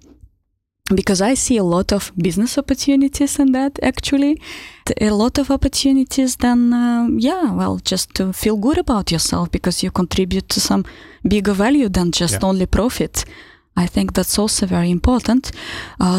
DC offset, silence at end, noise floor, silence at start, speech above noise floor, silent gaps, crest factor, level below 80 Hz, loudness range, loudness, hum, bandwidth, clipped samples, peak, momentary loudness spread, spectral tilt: under 0.1%; 0 s; -69 dBFS; 0.85 s; 52 dB; none; 10 dB; -32 dBFS; 2 LU; -17 LUFS; none; 16 kHz; under 0.1%; -6 dBFS; 6 LU; -4.5 dB/octave